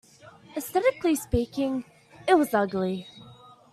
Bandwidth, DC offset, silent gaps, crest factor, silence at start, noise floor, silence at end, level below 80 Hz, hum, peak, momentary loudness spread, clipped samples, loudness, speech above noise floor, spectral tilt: 15 kHz; under 0.1%; none; 20 dB; 0.25 s; -51 dBFS; 0.4 s; -50 dBFS; none; -8 dBFS; 14 LU; under 0.1%; -26 LUFS; 26 dB; -5.5 dB/octave